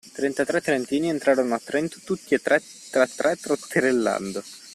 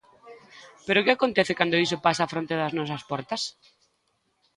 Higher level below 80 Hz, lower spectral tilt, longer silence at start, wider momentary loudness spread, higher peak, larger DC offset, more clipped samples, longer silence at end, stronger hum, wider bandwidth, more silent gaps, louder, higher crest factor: about the same, -66 dBFS vs -66 dBFS; about the same, -4.5 dB/octave vs -4.5 dB/octave; second, 0.05 s vs 0.25 s; second, 7 LU vs 10 LU; about the same, -6 dBFS vs -4 dBFS; neither; neither; second, 0 s vs 1.05 s; neither; first, 14 kHz vs 11.5 kHz; neither; about the same, -24 LUFS vs -25 LUFS; second, 18 dB vs 24 dB